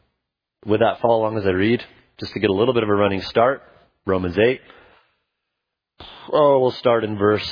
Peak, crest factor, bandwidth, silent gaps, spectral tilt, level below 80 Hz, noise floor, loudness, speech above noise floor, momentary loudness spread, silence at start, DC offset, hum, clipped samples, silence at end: -2 dBFS; 18 dB; 5.2 kHz; none; -8 dB/octave; -54 dBFS; -81 dBFS; -19 LUFS; 62 dB; 13 LU; 0.65 s; under 0.1%; none; under 0.1%; 0 s